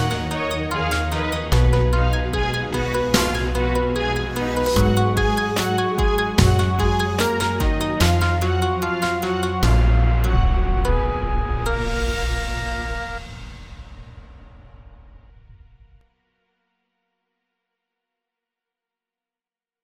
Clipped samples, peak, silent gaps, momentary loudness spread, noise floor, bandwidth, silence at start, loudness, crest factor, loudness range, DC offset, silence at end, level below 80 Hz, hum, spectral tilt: under 0.1%; -2 dBFS; none; 8 LU; under -90 dBFS; 18 kHz; 0 s; -21 LUFS; 18 dB; 9 LU; under 0.1%; 4.75 s; -26 dBFS; none; -5.5 dB/octave